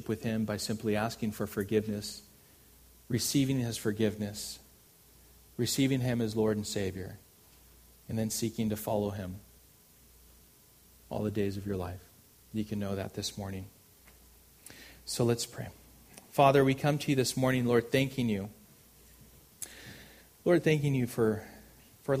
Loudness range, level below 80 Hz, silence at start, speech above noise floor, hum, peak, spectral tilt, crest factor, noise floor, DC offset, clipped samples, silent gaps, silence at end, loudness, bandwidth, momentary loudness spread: 9 LU; -60 dBFS; 0 s; 30 dB; none; -10 dBFS; -5.5 dB/octave; 22 dB; -60 dBFS; under 0.1%; under 0.1%; none; 0 s; -31 LUFS; 15.5 kHz; 18 LU